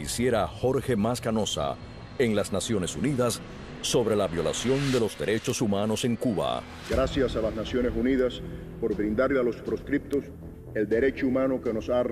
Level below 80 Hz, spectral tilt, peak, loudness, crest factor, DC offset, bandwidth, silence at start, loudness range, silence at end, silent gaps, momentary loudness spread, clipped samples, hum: -44 dBFS; -5 dB/octave; -12 dBFS; -27 LUFS; 14 dB; under 0.1%; 14.5 kHz; 0 s; 1 LU; 0 s; none; 8 LU; under 0.1%; none